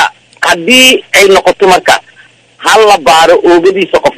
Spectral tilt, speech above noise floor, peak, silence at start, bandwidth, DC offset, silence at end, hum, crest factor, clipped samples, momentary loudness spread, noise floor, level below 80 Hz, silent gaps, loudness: -2 dB/octave; 35 dB; 0 dBFS; 0 s; 16 kHz; under 0.1%; 0.05 s; none; 6 dB; 5%; 8 LU; -40 dBFS; -42 dBFS; none; -5 LUFS